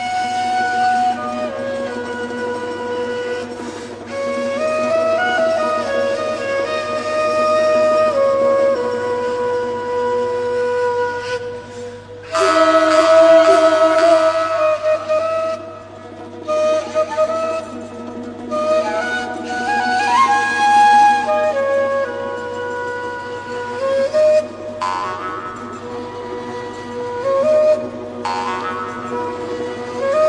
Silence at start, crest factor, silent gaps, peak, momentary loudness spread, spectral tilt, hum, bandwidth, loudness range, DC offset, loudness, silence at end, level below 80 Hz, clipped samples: 0 s; 16 dB; none; -2 dBFS; 16 LU; -4 dB/octave; 50 Hz at -45 dBFS; 10.5 kHz; 8 LU; under 0.1%; -17 LUFS; 0 s; -56 dBFS; under 0.1%